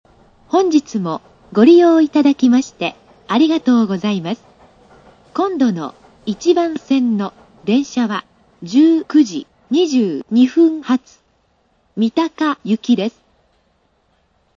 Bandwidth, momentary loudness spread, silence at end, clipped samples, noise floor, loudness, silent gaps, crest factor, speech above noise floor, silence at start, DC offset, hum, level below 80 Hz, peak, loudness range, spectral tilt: 7.4 kHz; 14 LU; 1.5 s; under 0.1%; -60 dBFS; -16 LUFS; none; 16 dB; 46 dB; 0.55 s; under 0.1%; none; -60 dBFS; 0 dBFS; 6 LU; -6 dB/octave